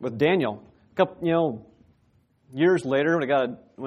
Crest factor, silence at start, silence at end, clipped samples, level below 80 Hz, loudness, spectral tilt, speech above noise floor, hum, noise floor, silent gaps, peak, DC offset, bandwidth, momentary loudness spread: 18 dB; 0 s; 0 s; under 0.1%; -66 dBFS; -24 LUFS; -7 dB/octave; 41 dB; none; -64 dBFS; none; -6 dBFS; under 0.1%; 11 kHz; 14 LU